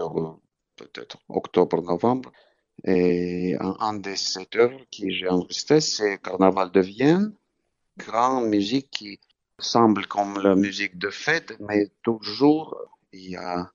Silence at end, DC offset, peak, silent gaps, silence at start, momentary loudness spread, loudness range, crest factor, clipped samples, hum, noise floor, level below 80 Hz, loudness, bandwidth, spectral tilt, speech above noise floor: 0.1 s; under 0.1%; -2 dBFS; none; 0 s; 13 LU; 3 LU; 22 dB; under 0.1%; none; -75 dBFS; -64 dBFS; -23 LUFS; 7.6 kHz; -5 dB/octave; 52 dB